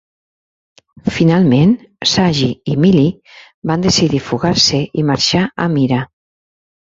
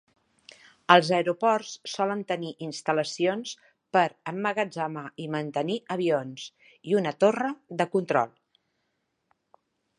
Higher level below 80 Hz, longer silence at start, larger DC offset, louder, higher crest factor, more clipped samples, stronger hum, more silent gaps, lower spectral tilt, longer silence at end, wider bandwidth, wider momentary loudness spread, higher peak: first, -44 dBFS vs -80 dBFS; first, 1.05 s vs 0.9 s; neither; first, -14 LUFS vs -27 LUFS; second, 14 dB vs 28 dB; neither; neither; first, 3.54-3.62 s vs none; about the same, -5 dB/octave vs -5 dB/octave; second, 0.8 s vs 1.7 s; second, 7.8 kHz vs 11 kHz; second, 8 LU vs 14 LU; about the same, -2 dBFS vs 0 dBFS